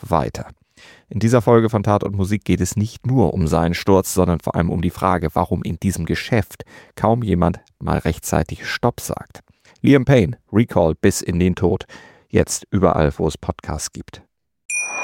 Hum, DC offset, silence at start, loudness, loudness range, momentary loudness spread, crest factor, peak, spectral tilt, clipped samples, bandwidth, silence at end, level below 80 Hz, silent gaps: none; under 0.1%; 0 s; -19 LUFS; 3 LU; 12 LU; 18 dB; -2 dBFS; -6 dB/octave; under 0.1%; 17 kHz; 0 s; -38 dBFS; 14.65-14.69 s